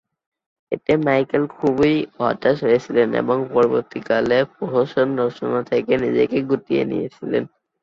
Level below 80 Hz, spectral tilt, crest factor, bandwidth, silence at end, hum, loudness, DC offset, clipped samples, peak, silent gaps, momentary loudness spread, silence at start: -56 dBFS; -7.5 dB/octave; 16 dB; 7.2 kHz; 0.35 s; none; -20 LUFS; under 0.1%; under 0.1%; -4 dBFS; none; 7 LU; 0.7 s